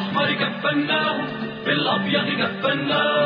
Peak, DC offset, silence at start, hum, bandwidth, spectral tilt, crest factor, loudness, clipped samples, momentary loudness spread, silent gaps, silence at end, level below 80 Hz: -8 dBFS; under 0.1%; 0 s; none; 5.2 kHz; -7.5 dB/octave; 14 dB; -21 LUFS; under 0.1%; 4 LU; none; 0 s; -62 dBFS